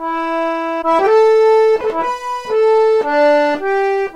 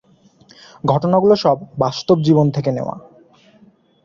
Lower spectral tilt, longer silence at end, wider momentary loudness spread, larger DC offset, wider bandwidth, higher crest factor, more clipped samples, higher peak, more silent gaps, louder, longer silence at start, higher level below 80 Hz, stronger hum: second, -4 dB/octave vs -8 dB/octave; second, 0 s vs 1.05 s; second, 8 LU vs 11 LU; neither; first, 9.8 kHz vs 7.4 kHz; second, 10 dB vs 16 dB; neither; about the same, -2 dBFS vs -2 dBFS; neither; first, -14 LUFS vs -17 LUFS; second, 0 s vs 0.85 s; about the same, -52 dBFS vs -54 dBFS; neither